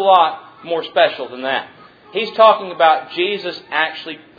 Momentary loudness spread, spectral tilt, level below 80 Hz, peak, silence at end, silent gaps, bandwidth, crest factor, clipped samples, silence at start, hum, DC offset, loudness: 13 LU; -5 dB/octave; -68 dBFS; 0 dBFS; 0.2 s; none; 5 kHz; 16 dB; under 0.1%; 0 s; none; under 0.1%; -17 LUFS